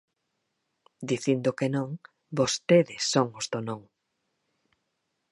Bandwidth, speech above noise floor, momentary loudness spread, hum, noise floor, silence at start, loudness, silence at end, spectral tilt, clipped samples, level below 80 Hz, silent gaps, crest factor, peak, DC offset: 11.5 kHz; 53 dB; 15 LU; none; -79 dBFS; 1 s; -27 LUFS; 1.5 s; -4.5 dB/octave; under 0.1%; -70 dBFS; none; 22 dB; -8 dBFS; under 0.1%